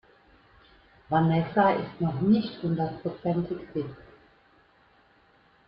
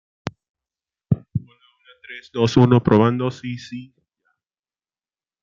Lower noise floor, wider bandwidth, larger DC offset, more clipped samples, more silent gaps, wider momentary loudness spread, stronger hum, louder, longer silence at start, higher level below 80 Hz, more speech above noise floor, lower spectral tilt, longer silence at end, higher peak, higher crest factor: second, -61 dBFS vs under -90 dBFS; second, 5.4 kHz vs 7.4 kHz; neither; neither; second, none vs 0.49-0.55 s; second, 10 LU vs 21 LU; neither; second, -27 LUFS vs -19 LUFS; first, 1.1 s vs 0.25 s; second, -60 dBFS vs -52 dBFS; second, 35 dB vs over 72 dB; first, -11 dB/octave vs -7.5 dB/octave; about the same, 1.65 s vs 1.6 s; second, -10 dBFS vs -2 dBFS; about the same, 18 dB vs 20 dB